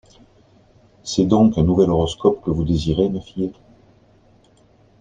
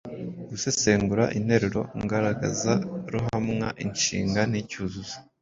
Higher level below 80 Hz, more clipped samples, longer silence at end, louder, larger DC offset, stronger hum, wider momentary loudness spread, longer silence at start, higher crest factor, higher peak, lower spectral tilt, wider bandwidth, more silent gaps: first, -40 dBFS vs -50 dBFS; neither; first, 1.5 s vs 0.2 s; first, -19 LUFS vs -26 LUFS; neither; neither; about the same, 12 LU vs 11 LU; first, 1.05 s vs 0.05 s; about the same, 18 dB vs 20 dB; first, -2 dBFS vs -6 dBFS; first, -7.5 dB/octave vs -4.5 dB/octave; first, 9.4 kHz vs 7.8 kHz; neither